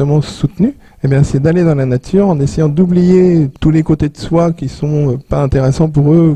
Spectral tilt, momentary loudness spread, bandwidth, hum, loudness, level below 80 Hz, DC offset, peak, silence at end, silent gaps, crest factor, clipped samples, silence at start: -8.5 dB/octave; 7 LU; 9.4 kHz; none; -12 LUFS; -30 dBFS; 0.5%; 0 dBFS; 0 s; none; 10 dB; under 0.1%; 0 s